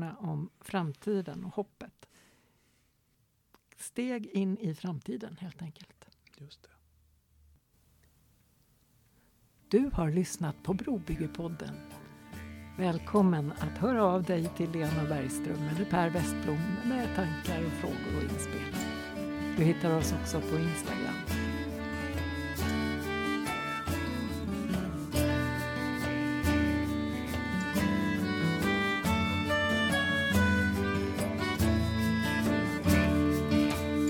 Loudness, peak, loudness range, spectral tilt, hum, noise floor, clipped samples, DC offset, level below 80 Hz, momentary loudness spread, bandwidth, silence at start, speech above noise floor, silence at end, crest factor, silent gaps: -31 LUFS; -14 dBFS; 10 LU; -5.5 dB/octave; none; -72 dBFS; under 0.1%; under 0.1%; -46 dBFS; 11 LU; 19 kHz; 0 s; 40 dB; 0 s; 18 dB; none